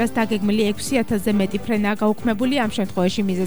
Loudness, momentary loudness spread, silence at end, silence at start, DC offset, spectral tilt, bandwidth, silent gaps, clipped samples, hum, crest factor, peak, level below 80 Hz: -21 LUFS; 2 LU; 0 s; 0 s; 2%; -5.5 dB/octave; over 20 kHz; none; under 0.1%; none; 14 dB; -6 dBFS; -46 dBFS